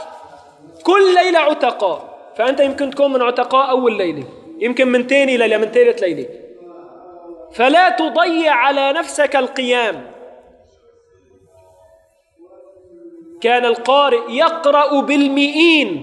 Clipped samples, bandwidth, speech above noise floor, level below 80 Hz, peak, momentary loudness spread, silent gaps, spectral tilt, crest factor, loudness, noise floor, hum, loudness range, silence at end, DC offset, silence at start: under 0.1%; 11.5 kHz; 39 dB; -64 dBFS; 0 dBFS; 11 LU; none; -3.5 dB/octave; 16 dB; -14 LUFS; -53 dBFS; none; 6 LU; 0 s; under 0.1%; 0 s